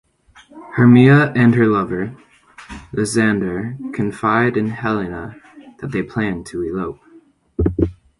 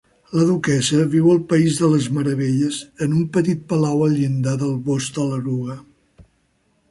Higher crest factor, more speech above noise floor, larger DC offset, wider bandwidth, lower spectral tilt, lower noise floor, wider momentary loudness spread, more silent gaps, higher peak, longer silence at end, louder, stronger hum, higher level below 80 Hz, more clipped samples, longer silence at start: about the same, 18 dB vs 14 dB; second, 33 dB vs 46 dB; neither; about the same, 11.5 kHz vs 11.5 kHz; about the same, -7 dB/octave vs -6 dB/octave; second, -49 dBFS vs -64 dBFS; first, 17 LU vs 8 LU; neither; first, 0 dBFS vs -4 dBFS; second, 0.25 s vs 0.7 s; about the same, -17 LUFS vs -19 LUFS; neither; first, -38 dBFS vs -56 dBFS; neither; first, 0.55 s vs 0.3 s